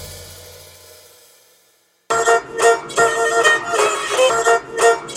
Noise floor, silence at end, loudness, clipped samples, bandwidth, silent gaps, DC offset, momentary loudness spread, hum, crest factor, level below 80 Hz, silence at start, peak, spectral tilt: -58 dBFS; 0 s; -16 LUFS; under 0.1%; 16.5 kHz; none; under 0.1%; 16 LU; none; 18 dB; -54 dBFS; 0 s; 0 dBFS; -1 dB/octave